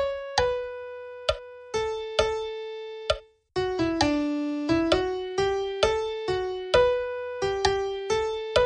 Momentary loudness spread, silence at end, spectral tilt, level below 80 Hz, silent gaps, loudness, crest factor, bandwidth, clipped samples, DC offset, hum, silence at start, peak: 10 LU; 0 s; -4.5 dB/octave; -46 dBFS; none; -27 LUFS; 20 dB; 11 kHz; under 0.1%; under 0.1%; none; 0 s; -6 dBFS